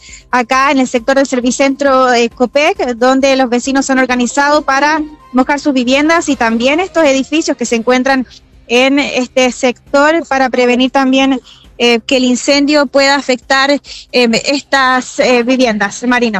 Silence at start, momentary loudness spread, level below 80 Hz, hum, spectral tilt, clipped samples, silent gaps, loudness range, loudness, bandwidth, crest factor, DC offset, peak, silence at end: 0.05 s; 4 LU; -44 dBFS; none; -3 dB/octave; under 0.1%; none; 1 LU; -11 LUFS; 11.5 kHz; 12 dB; under 0.1%; 0 dBFS; 0 s